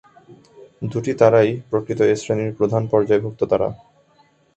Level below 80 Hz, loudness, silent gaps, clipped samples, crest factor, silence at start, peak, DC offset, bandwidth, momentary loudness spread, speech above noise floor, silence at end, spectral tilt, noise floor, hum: -54 dBFS; -19 LUFS; none; under 0.1%; 20 dB; 0.3 s; 0 dBFS; under 0.1%; 8.2 kHz; 11 LU; 39 dB; 0.8 s; -7 dB/octave; -57 dBFS; none